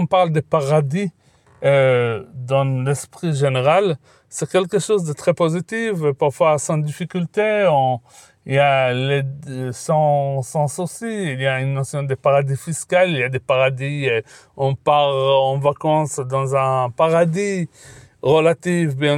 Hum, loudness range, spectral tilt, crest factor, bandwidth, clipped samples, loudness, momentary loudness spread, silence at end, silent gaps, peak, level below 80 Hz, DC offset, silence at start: none; 2 LU; -5.5 dB/octave; 16 dB; 14 kHz; under 0.1%; -19 LUFS; 9 LU; 0 s; none; -2 dBFS; -62 dBFS; under 0.1%; 0 s